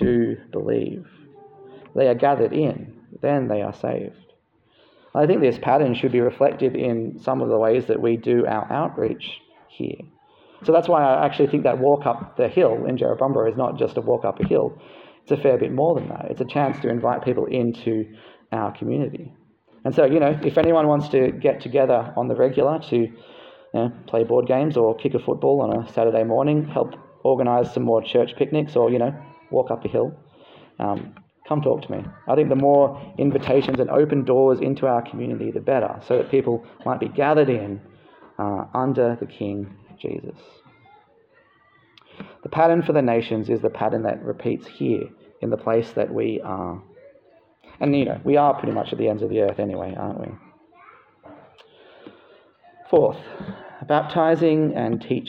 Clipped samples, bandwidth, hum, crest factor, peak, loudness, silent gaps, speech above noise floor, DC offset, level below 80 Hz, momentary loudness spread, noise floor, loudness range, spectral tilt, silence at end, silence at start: under 0.1%; 6.6 kHz; none; 18 dB; -4 dBFS; -21 LUFS; none; 40 dB; under 0.1%; -58 dBFS; 12 LU; -60 dBFS; 7 LU; -9.5 dB/octave; 0 s; 0 s